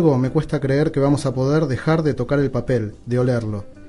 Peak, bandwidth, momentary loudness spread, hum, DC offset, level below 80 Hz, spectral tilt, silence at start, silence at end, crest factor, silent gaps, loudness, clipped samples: -4 dBFS; 11.5 kHz; 5 LU; none; under 0.1%; -42 dBFS; -8 dB/octave; 0 s; 0 s; 14 dB; none; -20 LUFS; under 0.1%